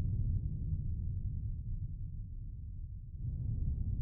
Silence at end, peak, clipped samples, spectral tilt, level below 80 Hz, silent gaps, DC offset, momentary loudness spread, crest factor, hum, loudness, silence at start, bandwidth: 0 s; -24 dBFS; under 0.1%; -20 dB/octave; -40 dBFS; none; under 0.1%; 10 LU; 14 dB; none; -41 LUFS; 0 s; 0.8 kHz